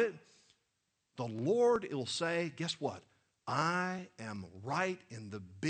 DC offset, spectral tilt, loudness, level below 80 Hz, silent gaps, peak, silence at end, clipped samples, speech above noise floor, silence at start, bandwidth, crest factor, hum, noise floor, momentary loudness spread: under 0.1%; -5 dB/octave; -36 LUFS; -76 dBFS; none; -16 dBFS; 0 s; under 0.1%; 47 dB; 0 s; 9 kHz; 20 dB; none; -83 dBFS; 17 LU